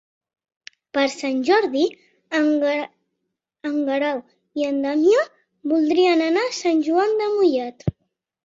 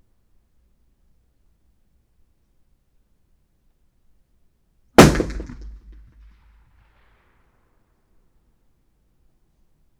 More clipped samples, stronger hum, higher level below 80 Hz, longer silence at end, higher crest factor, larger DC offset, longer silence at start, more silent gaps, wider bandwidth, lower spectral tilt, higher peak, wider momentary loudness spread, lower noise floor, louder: neither; neither; second, -56 dBFS vs -40 dBFS; second, 0.55 s vs 4.55 s; second, 16 dB vs 26 dB; neither; second, 0.95 s vs 5 s; neither; second, 8 kHz vs over 20 kHz; about the same, -5 dB/octave vs -5 dB/octave; second, -6 dBFS vs 0 dBFS; second, 12 LU vs 30 LU; first, -79 dBFS vs -63 dBFS; second, -21 LUFS vs -15 LUFS